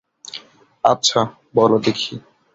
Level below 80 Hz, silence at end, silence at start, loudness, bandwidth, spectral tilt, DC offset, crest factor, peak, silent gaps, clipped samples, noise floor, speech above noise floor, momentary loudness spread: -58 dBFS; 0.35 s; 0.35 s; -18 LUFS; 8 kHz; -4 dB/octave; under 0.1%; 18 dB; -2 dBFS; none; under 0.1%; -39 dBFS; 22 dB; 19 LU